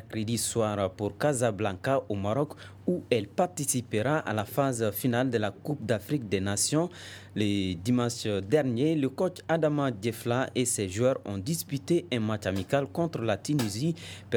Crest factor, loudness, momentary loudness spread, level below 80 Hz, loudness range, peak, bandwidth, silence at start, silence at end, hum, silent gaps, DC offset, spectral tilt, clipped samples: 18 dB; -29 LUFS; 5 LU; -64 dBFS; 1 LU; -10 dBFS; over 20 kHz; 0 s; 0 s; none; none; under 0.1%; -5 dB/octave; under 0.1%